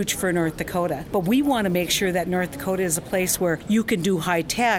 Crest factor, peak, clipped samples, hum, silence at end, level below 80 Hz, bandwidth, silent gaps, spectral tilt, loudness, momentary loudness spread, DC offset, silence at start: 16 dB; -8 dBFS; under 0.1%; none; 0 s; -48 dBFS; 16.5 kHz; none; -4 dB/octave; -23 LUFS; 4 LU; under 0.1%; 0 s